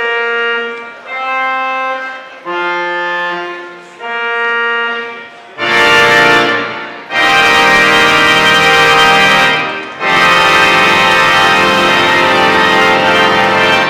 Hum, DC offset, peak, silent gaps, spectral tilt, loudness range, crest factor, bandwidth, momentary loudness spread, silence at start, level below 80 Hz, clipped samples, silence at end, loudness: none; under 0.1%; 0 dBFS; none; -2.5 dB/octave; 9 LU; 10 dB; 17 kHz; 15 LU; 0 s; -44 dBFS; 0.1%; 0 s; -8 LUFS